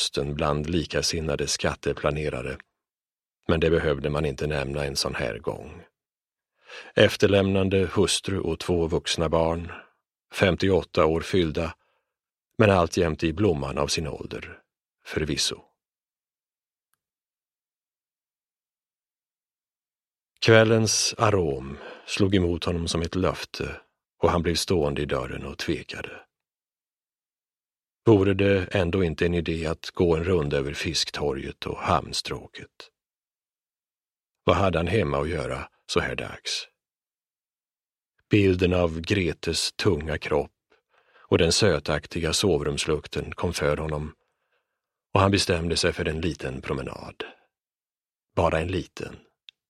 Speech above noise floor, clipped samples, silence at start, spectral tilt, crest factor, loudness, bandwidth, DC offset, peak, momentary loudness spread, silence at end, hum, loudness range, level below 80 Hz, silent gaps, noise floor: over 66 dB; under 0.1%; 0 s; -4.5 dB/octave; 24 dB; -25 LUFS; 14.5 kHz; under 0.1%; -2 dBFS; 15 LU; 0.55 s; none; 6 LU; -44 dBFS; none; under -90 dBFS